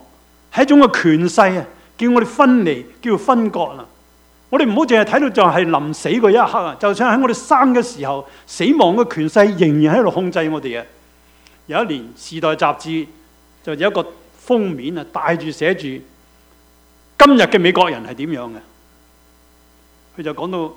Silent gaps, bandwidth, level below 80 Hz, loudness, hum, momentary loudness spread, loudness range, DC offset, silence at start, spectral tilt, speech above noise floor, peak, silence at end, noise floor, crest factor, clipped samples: none; 16 kHz; -52 dBFS; -15 LUFS; none; 15 LU; 7 LU; under 0.1%; 0.55 s; -5.5 dB/octave; 36 dB; 0 dBFS; 0.05 s; -51 dBFS; 16 dB; under 0.1%